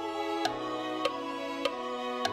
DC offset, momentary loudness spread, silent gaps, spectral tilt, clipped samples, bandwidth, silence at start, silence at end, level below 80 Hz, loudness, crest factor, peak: under 0.1%; 4 LU; none; -3.5 dB/octave; under 0.1%; 16 kHz; 0 s; 0 s; -68 dBFS; -33 LUFS; 18 dB; -14 dBFS